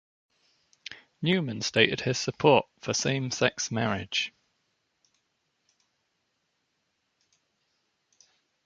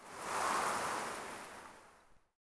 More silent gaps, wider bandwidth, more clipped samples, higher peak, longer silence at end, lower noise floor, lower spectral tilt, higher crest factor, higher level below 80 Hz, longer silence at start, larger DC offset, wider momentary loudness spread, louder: neither; second, 9.4 kHz vs 11 kHz; neither; first, -4 dBFS vs -22 dBFS; first, 4.35 s vs 0.4 s; first, -77 dBFS vs -64 dBFS; first, -4 dB/octave vs -1.5 dB/octave; first, 26 dB vs 18 dB; first, -64 dBFS vs -72 dBFS; first, 0.9 s vs 0 s; neither; second, 16 LU vs 19 LU; first, -27 LUFS vs -38 LUFS